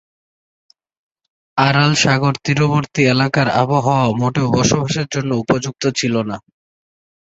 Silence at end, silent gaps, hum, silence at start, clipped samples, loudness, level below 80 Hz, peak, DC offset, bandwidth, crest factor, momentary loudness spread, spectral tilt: 1 s; none; none; 1.55 s; under 0.1%; -16 LUFS; -48 dBFS; -2 dBFS; under 0.1%; 8 kHz; 16 dB; 7 LU; -5 dB/octave